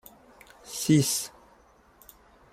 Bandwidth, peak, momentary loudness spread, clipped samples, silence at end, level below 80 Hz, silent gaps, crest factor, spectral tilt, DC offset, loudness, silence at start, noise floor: 16 kHz; -10 dBFS; 18 LU; under 0.1%; 1.25 s; -64 dBFS; none; 20 dB; -4.5 dB/octave; under 0.1%; -26 LUFS; 0.65 s; -59 dBFS